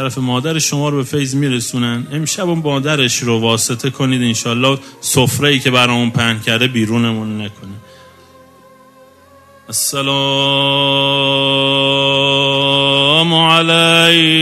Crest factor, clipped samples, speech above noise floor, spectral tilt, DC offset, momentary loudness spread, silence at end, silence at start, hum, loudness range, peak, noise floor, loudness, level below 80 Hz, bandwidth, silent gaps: 14 dB; under 0.1%; 30 dB; -3.5 dB/octave; under 0.1%; 8 LU; 0 s; 0 s; none; 9 LU; 0 dBFS; -44 dBFS; -13 LUFS; -54 dBFS; 15.5 kHz; none